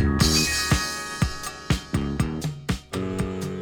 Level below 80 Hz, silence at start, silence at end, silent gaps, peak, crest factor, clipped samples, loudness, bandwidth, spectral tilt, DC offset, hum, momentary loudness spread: -34 dBFS; 0 s; 0 s; none; -6 dBFS; 20 dB; under 0.1%; -25 LUFS; 19.5 kHz; -4 dB/octave; under 0.1%; none; 10 LU